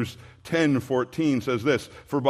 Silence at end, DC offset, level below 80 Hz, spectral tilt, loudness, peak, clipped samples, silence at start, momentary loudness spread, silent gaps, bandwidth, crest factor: 0 s; under 0.1%; -60 dBFS; -6 dB/octave; -25 LUFS; -6 dBFS; under 0.1%; 0 s; 8 LU; none; 14.5 kHz; 18 dB